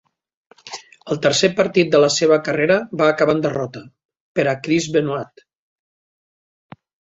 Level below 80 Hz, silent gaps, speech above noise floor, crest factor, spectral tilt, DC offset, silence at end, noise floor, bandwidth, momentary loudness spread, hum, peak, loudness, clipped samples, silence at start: -60 dBFS; 4.05-4.09 s, 4.20-4.35 s; 20 dB; 18 dB; -4.5 dB/octave; under 0.1%; 1.95 s; -38 dBFS; 8.2 kHz; 20 LU; none; -2 dBFS; -18 LUFS; under 0.1%; 0.65 s